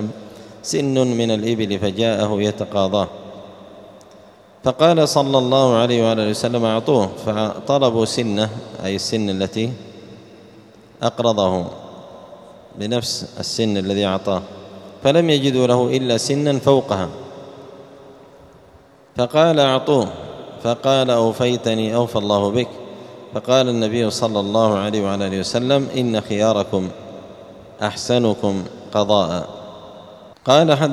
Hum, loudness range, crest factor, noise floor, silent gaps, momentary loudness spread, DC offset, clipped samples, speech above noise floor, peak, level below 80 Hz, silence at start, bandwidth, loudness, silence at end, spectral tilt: none; 6 LU; 20 dB; -48 dBFS; none; 21 LU; under 0.1%; under 0.1%; 30 dB; 0 dBFS; -56 dBFS; 0 s; 14 kHz; -18 LUFS; 0 s; -5.5 dB/octave